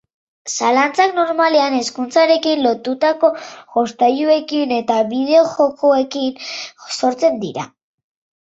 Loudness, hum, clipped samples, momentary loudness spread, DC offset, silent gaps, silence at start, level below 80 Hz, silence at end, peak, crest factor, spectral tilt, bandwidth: -16 LUFS; none; under 0.1%; 12 LU; under 0.1%; none; 0.45 s; -66 dBFS; 0.8 s; -2 dBFS; 16 dB; -3.5 dB/octave; 8 kHz